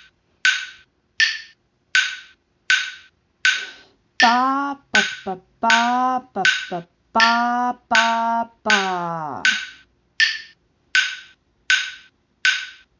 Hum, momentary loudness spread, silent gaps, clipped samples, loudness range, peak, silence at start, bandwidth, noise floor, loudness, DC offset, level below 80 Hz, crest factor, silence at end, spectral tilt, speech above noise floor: none; 14 LU; none; under 0.1%; 3 LU; -2 dBFS; 0.45 s; 7.6 kHz; -54 dBFS; -19 LUFS; under 0.1%; -66 dBFS; 20 dB; 0.25 s; -1.5 dB/octave; 35 dB